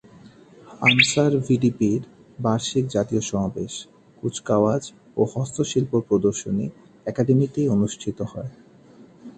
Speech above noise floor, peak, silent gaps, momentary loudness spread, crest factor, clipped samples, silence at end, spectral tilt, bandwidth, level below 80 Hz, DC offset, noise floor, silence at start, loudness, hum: 27 dB; -4 dBFS; none; 14 LU; 20 dB; under 0.1%; 0.05 s; -5 dB/octave; 9.8 kHz; -54 dBFS; under 0.1%; -49 dBFS; 0.25 s; -22 LUFS; none